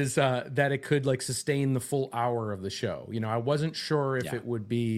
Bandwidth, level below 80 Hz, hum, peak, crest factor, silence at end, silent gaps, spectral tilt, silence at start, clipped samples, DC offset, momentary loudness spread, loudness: 14.5 kHz; -64 dBFS; none; -8 dBFS; 20 dB; 0 s; none; -5.5 dB/octave; 0 s; under 0.1%; under 0.1%; 6 LU; -29 LUFS